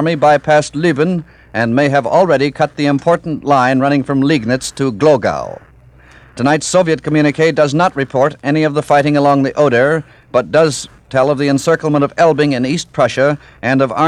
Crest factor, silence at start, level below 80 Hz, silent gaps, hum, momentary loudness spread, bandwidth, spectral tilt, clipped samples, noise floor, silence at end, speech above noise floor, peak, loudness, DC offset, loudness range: 12 dB; 0 s; -48 dBFS; none; none; 7 LU; 12.5 kHz; -5.5 dB/octave; under 0.1%; -42 dBFS; 0 s; 30 dB; 0 dBFS; -13 LUFS; under 0.1%; 2 LU